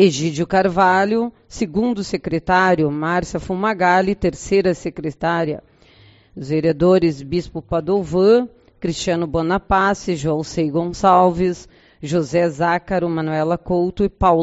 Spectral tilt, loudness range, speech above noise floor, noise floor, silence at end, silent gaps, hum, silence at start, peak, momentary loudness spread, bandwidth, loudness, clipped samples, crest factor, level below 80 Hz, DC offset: -5 dB/octave; 2 LU; 32 dB; -49 dBFS; 0 s; none; none; 0 s; 0 dBFS; 10 LU; 8 kHz; -18 LUFS; under 0.1%; 18 dB; -40 dBFS; under 0.1%